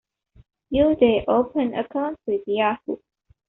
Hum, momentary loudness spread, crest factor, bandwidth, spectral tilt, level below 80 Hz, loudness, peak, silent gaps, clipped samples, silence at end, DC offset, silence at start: none; 11 LU; 18 dB; 4.1 kHz; -4 dB/octave; -50 dBFS; -22 LUFS; -6 dBFS; none; under 0.1%; 0.55 s; under 0.1%; 0.7 s